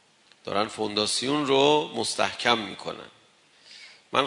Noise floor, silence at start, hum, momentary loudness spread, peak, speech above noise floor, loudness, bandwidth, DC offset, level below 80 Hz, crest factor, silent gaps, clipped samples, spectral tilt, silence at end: -58 dBFS; 0.45 s; none; 22 LU; -4 dBFS; 33 dB; -25 LUFS; 11 kHz; under 0.1%; -68 dBFS; 24 dB; none; under 0.1%; -3 dB/octave; 0 s